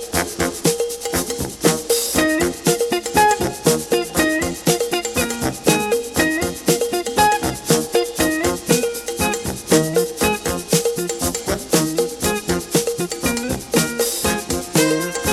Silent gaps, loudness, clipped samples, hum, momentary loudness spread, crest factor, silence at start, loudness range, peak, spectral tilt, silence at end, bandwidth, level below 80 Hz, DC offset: none; -19 LUFS; under 0.1%; none; 5 LU; 18 dB; 0 s; 2 LU; 0 dBFS; -3.5 dB/octave; 0 s; 19.5 kHz; -40 dBFS; under 0.1%